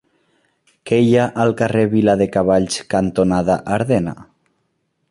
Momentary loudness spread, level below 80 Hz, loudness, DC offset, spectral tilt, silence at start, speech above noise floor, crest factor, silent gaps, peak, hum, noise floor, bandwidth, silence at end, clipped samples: 5 LU; -46 dBFS; -17 LUFS; under 0.1%; -6.5 dB/octave; 0.85 s; 53 dB; 16 dB; none; -2 dBFS; none; -68 dBFS; 11.5 kHz; 0.85 s; under 0.1%